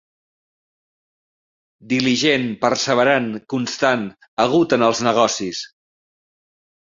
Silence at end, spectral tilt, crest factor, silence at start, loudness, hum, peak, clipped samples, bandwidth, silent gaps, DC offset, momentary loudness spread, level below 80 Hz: 1.15 s; -4 dB/octave; 18 dB; 1.85 s; -18 LUFS; none; -2 dBFS; under 0.1%; 7.6 kHz; 4.28-4.37 s; under 0.1%; 9 LU; -60 dBFS